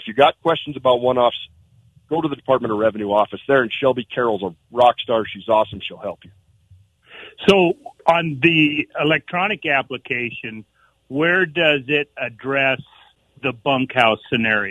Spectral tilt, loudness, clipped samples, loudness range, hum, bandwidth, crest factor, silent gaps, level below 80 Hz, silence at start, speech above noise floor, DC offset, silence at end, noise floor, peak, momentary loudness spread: -6 dB/octave; -19 LUFS; under 0.1%; 3 LU; none; 12 kHz; 20 dB; none; -58 dBFS; 0 s; 34 dB; under 0.1%; 0 s; -53 dBFS; 0 dBFS; 11 LU